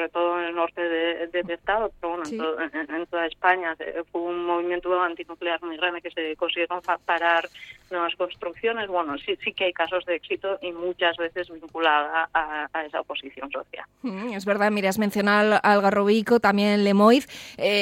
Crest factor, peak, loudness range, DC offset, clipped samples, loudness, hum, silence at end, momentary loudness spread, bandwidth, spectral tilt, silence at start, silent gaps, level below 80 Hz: 18 dB; -6 dBFS; 6 LU; under 0.1%; under 0.1%; -24 LUFS; 50 Hz at -65 dBFS; 0 s; 12 LU; 16.5 kHz; -5 dB/octave; 0 s; none; -60 dBFS